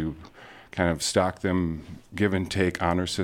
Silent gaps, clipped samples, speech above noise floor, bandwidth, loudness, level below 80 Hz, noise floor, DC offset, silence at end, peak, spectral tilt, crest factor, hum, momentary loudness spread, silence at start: none; under 0.1%; 22 dB; 16.5 kHz; -26 LUFS; -48 dBFS; -48 dBFS; under 0.1%; 0 s; -8 dBFS; -5 dB/octave; 20 dB; none; 15 LU; 0 s